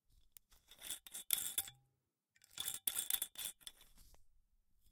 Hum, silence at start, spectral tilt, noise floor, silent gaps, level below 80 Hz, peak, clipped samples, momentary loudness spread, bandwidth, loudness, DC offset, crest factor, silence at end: none; 0.5 s; 1.5 dB/octave; -86 dBFS; none; -74 dBFS; -14 dBFS; under 0.1%; 18 LU; 18 kHz; -41 LUFS; under 0.1%; 32 dB; 0.6 s